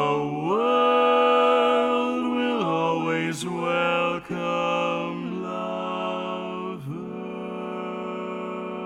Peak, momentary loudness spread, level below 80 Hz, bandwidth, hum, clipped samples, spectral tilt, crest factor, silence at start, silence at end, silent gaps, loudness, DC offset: -8 dBFS; 13 LU; -66 dBFS; 12 kHz; none; under 0.1%; -5.5 dB/octave; 16 dB; 0 s; 0 s; none; -24 LUFS; under 0.1%